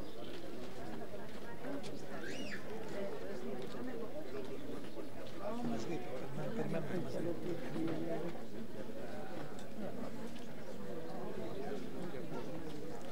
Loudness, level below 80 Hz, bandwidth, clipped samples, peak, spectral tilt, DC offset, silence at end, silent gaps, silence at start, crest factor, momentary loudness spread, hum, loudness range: -45 LUFS; -66 dBFS; 16 kHz; under 0.1%; -26 dBFS; -6 dB/octave; 2%; 0 s; none; 0 s; 18 dB; 8 LU; none; 4 LU